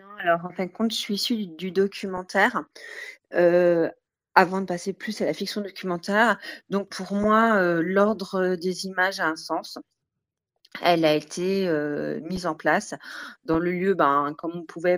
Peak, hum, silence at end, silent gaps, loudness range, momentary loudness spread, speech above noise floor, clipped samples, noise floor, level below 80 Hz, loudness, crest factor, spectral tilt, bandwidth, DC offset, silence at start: 0 dBFS; none; 0 s; none; 3 LU; 12 LU; 61 dB; under 0.1%; -85 dBFS; -60 dBFS; -24 LUFS; 24 dB; -5 dB/octave; over 20 kHz; under 0.1%; 0.05 s